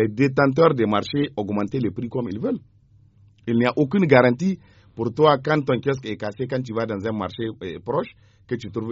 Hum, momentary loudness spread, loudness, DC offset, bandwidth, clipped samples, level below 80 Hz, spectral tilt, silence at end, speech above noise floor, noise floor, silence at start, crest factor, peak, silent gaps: none; 13 LU; -22 LUFS; under 0.1%; 7.6 kHz; under 0.1%; -58 dBFS; -5.5 dB/octave; 0 s; 33 dB; -54 dBFS; 0 s; 20 dB; -2 dBFS; none